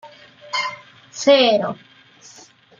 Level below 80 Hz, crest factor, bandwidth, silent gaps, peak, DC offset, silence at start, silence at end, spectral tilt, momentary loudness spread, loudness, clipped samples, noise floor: -70 dBFS; 20 dB; 7.6 kHz; none; -2 dBFS; under 0.1%; 0.05 s; 1.05 s; -3 dB/octave; 23 LU; -18 LUFS; under 0.1%; -48 dBFS